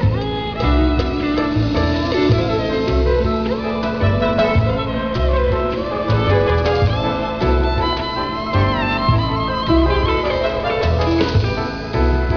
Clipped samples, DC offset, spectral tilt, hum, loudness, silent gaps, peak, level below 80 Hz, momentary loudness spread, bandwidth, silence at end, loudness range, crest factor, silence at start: under 0.1%; 0.4%; -7.5 dB/octave; none; -18 LUFS; none; -2 dBFS; -24 dBFS; 5 LU; 5.4 kHz; 0 s; 1 LU; 14 dB; 0 s